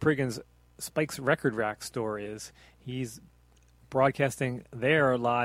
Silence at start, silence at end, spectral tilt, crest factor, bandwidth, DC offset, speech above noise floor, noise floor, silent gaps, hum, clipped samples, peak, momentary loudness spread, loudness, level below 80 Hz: 0 s; 0 s; -5.5 dB/octave; 20 dB; 16 kHz; under 0.1%; 31 dB; -61 dBFS; none; none; under 0.1%; -10 dBFS; 17 LU; -29 LUFS; -60 dBFS